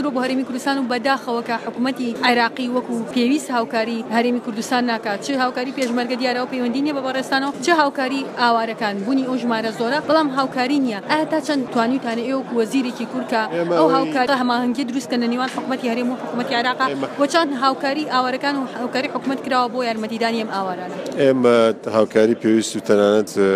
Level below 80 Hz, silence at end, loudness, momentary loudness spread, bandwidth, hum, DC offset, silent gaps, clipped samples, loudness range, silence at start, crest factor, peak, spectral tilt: -70 dBFS; 0 s; -20 LUFS; 7 LU; 14.5 kHz; none; under 0.1%; none; under 0.1%; 2 LU; 0 s; 18 dB; -2 dBFS; -4.5 dB/octave